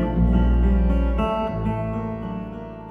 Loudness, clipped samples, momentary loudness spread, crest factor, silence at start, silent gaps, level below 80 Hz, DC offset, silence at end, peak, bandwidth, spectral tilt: -23 LUFS; under 0.1%; 12 LU; 14 dB; 0 s; none; -24 dBFS; under 0.1%; 0 s; -6 dBFS; 3.5 kHz; -10 dB/octave